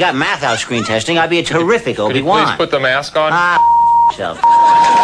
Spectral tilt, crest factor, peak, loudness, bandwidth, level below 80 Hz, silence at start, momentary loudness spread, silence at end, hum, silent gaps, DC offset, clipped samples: -4 dB/octave; 10 dB; -2 dBFS; -12 LUFS; 11 kHz; -46 dBFS; 0 s; 7 LU; 0 s; none; none; under 0.1%; under 0.1%